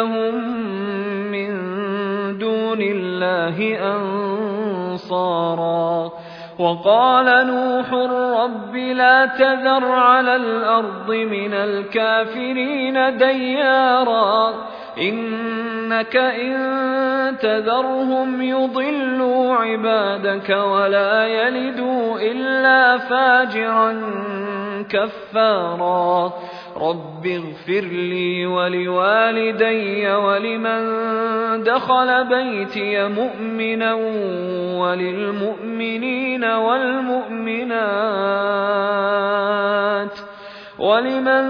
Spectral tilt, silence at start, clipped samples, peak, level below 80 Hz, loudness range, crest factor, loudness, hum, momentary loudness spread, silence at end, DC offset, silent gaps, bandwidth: -7.5 dB/octave; 0 s; under 0.1%; -2 dBFS; -66 dBFS; 5 LU; 18 dB; -18 LUFS; none; 9 LU; 0 s; under 0.1%; none; 5.4 kHz